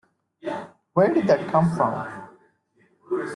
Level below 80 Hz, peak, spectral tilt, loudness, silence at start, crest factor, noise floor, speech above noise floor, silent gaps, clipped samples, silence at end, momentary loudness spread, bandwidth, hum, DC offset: -62 dBFS; -6 dBFS; -8 dB/octave; -23 LUFS; 0.45 s; 18 dB; -63 dBFS; 43 dB; none; under 0.1%; 0 s; 16 LU; 11 kHz; none; under 0.1%